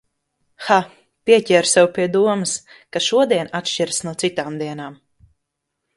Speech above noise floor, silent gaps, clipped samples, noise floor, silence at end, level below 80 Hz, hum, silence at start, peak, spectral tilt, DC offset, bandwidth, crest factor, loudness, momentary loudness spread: 59 dB; none; under 0.1%; -77 dBFS; 1.05 s; -62 dBFS; none; 0.6 s; 0 dBFS; -3.5 dB/octave; under 0.1%; 11.5 kHz; 20 dB; -18 LUFS; 14 LU